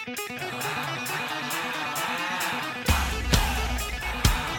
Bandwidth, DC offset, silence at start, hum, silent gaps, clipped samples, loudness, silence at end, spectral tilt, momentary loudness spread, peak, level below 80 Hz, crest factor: 19 kHz; under 0.1%; 0 s; none; none; under 0.1%; -27 LUFS; 0 s; -3.5 dB/octave; 6 LU; -6 dBFS; -32 dBFS; 22 dB